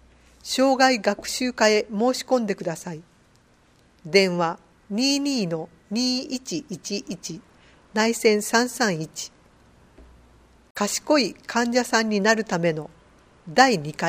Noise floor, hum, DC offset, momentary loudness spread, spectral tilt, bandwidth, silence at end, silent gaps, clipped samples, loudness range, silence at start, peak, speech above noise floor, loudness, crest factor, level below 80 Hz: -58 dBFS; none; under 0.1%; 15 LU; -3.5 dB/octave; 15.5 kHz; 0 s; 10.71-10.75 s; under 0.1%; 4 LU; 0.45 s; 0 dBFS; 35 dB; -23 LUFS; 24 dB; -60 dBFS